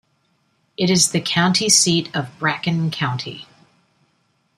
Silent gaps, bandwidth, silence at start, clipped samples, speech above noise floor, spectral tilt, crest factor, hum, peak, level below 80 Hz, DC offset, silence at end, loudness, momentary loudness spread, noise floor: none; 13.5 kHz; 0.8 s; under 0.1%; 46 dB; -3 dB/octave; 20 dB; none; 0 dBFS; -60 dBFS; under 0.1%; 1.15 s; -17 LUFS; 15 LU; -65 dBFS